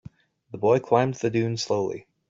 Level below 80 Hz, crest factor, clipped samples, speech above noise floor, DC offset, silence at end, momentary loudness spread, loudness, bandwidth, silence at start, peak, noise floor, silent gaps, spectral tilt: -64 dBFS; 20 dB; under 0.1%; 25 dB; under 0.1%; 0.3 s; 8 LU; -24 LUFS; 7.8 kHz; 0.5 s; -6 dBFS; -48 dBFS; none; -6 dB/octave